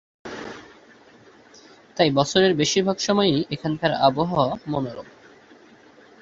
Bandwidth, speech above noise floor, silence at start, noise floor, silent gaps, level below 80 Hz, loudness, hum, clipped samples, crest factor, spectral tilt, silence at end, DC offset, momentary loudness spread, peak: 7.8 kHz; 30 dB; 0.25 s; -51 dBFS; none; -58 dBFS; -21 LUFS; none; under 0.1%; 20 dB; -4.5 dB/octave; 1.1 s; under 0.1%; 19 LU; -2 dBFS